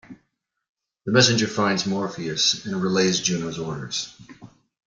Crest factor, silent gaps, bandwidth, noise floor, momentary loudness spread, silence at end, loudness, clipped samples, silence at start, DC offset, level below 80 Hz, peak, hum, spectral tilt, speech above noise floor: 22 dB; 0.69-0.75 s; 9.6 kHz; -73 dBFS; 12 LU; 0.4 s; -22 LUFS; under 0.1%; 0.1 s; under 0.1%; -62 dBFS; -4 dBFS; none; -3.5 dB/octave; 50 dB